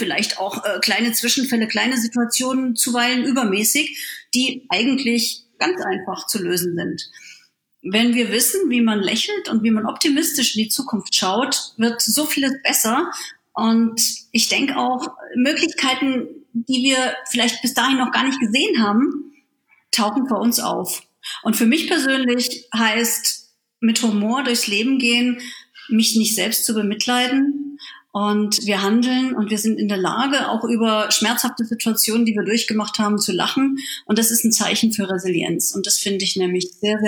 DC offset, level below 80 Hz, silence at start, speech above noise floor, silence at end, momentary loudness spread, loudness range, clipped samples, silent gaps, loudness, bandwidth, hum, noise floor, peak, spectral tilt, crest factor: under 0.1%; -74 dBFS; 0 s; 42 dB; 0 s; 7 LU; 2 LU; under 0.1%; none; -19 LUFS; over 20 kHz; none; -61 dBFS; 0 dBFS; -2.5 dB/octave; 20 dB